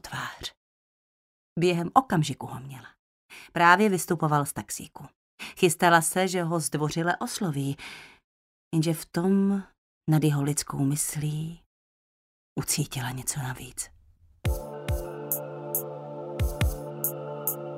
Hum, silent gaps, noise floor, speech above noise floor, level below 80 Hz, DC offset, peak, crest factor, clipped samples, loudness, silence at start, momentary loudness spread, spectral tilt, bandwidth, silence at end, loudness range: none; 0.57-1.56 s, 2.99-3.29 s, 5.16-5.38 s, 8.24-8.71 s, 9.78-10.01 s, 11.66-12.56 s; -59 dBFS; 33 dB; -44 dBFS; under 0.1%; -2 dBFS; 26 dB; under 0.1%; -27 LUFS; 0.05 s; 17 LU; -4.5 dB/octave; 16 kHz; 0 s; 8 LU